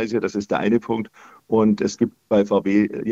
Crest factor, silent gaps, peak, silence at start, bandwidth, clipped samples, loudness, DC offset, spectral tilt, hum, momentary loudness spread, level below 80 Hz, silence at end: 16 dB; none; -6 dBFS; 0 s; 7.8 kHz; under 0.1%; -21 LUFS; under 0.1%; -6.5 dB/octave; none; 7 LU; -58 dBFS; 0 s